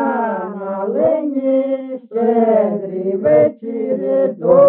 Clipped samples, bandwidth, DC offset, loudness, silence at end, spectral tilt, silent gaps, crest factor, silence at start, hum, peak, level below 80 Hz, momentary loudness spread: under 0.1%; 3.6 kHz; under 0.1%; -17 LUFS; 0 s; -8 dB/octave; none; 14 dB; 0 s; none; 0 dBFS; -62 dBFS; 10 LU